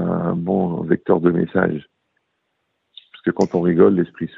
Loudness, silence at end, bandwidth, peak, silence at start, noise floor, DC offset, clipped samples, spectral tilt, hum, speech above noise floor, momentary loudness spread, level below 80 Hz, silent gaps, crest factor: -19 LUFS; 0.1 s; 7.4 kHz; 0 dBFS; 0 s; -72 dBFS; under 0.1%; under 0.1%; -9 dB/octave; none; 55 dB; 8 LU; -56 dBFS; none; 18 dB